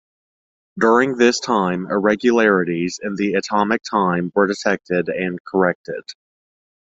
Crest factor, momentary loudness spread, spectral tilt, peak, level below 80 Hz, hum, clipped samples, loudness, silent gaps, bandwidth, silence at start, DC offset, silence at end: 18 dB; 8 LU; -5 dB/octave; -2 dBFS; -58 dBFS; none; under 0.1%; -18 LUFS; 5.40-5.45 s, 5.75-5.84 s; 7.8 kHz; 0.75 s; under 0.1%; 0.85 s